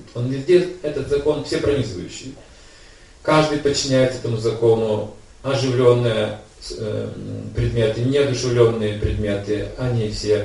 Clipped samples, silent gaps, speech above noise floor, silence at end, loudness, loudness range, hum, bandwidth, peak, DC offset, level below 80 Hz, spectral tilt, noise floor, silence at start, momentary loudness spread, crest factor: under 0.1%; none; 26 dB; 0 s; -20 LUFS; 3 LU; none; 11.5 kHz; 0 dBFS; under 0.1%; -38 dBFS; -6 dB/octave; -45 dBFS; 0 s; 13 LU; 20 dB